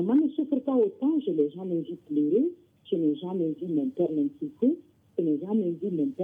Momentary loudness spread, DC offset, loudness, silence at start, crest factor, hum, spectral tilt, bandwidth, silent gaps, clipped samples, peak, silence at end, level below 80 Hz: 7 LU; under 0.1%; -28 LUFS; 0 s; 14 dB; none; -10.5 dB/octave; 3.7 kHz; none; under 0.1%; -14 dBFS; 0 s; -78 dBFS